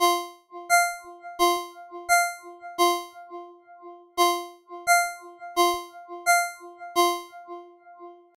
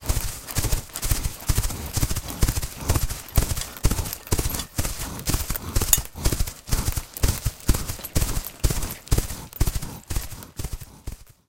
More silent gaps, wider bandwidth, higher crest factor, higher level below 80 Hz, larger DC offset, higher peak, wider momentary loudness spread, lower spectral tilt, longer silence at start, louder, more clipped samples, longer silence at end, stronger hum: neither; about the same, 17 kHz vs 17 kHz; second, 18 dB vs 24 dB; second, -66 dBFS vs -28 dBFS; neither; second, -8 dBFS vs 0 dBFS; first, 20 LU vs 7 LU; second, 0 dB/octave vs -3.5 dB/octave; about the same, 0 s vs 0 s; about the same, -24 LUFS vs -26 LUFS; neither; about the same, 0.25 s vs 0.25 s; neither